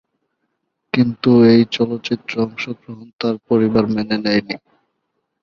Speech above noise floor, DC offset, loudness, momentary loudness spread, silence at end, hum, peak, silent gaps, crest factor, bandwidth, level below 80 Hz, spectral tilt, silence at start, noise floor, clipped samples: 56 dB; under 0.1%; -17 LUFS; 16 LU; 0.85 s; none; -2 dBFS; 3.13-3.19 s; 16 dB; 6.8 kHz; -54 dBFS; -7.5 dB/octave; 0.95 s; -72 dBFS; under 0.1%